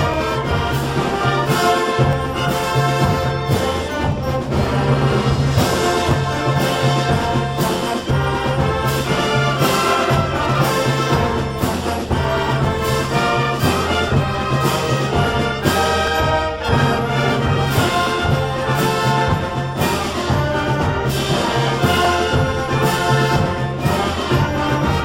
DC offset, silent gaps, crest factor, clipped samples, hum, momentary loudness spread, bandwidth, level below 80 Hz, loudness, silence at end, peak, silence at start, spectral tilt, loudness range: under 0.1%; none; 16 dB; under 0.1%; none; 3 LU; 16.5 kHz; -34 dBFS; -18 LUFS; 0 s; -2 dBFS; 0 s; -5.5 dB/octave; 1 LU